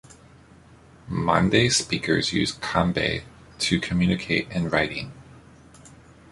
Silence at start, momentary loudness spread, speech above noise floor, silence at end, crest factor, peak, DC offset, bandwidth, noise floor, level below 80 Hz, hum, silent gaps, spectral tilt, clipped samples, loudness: 1.05 s; 9 LU; 28 dB; 0.45 s; 22 dB; -4 dBFS; under 0.1%; 11.5 kHz; -51 dBFS; -46 dBFS; none; none; -4.5 dB/octave; under 0.1%; -23 LUFS